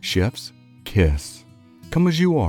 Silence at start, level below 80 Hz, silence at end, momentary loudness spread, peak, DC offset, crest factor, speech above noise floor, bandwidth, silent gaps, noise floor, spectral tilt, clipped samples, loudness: 0.05 s; -34 dBFS; 0 s; 19 LU; -4 dBFS; under 0.1%; 18 dB; 19 dB; 16.5 kHz; none; -39 dBFS; -6 dB/octave; under 0.1%; -21 LUFS